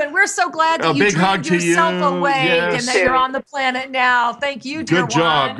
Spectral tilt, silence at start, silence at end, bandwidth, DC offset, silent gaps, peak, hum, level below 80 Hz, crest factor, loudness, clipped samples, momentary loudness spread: -4 dB/octave; 0 s; 0 s; 12.5 kHz; under 0.1%; none; -2 dBFS; none; -52 dBFS; 14 dB; -16 LUFS; under 0.1%; 5 LU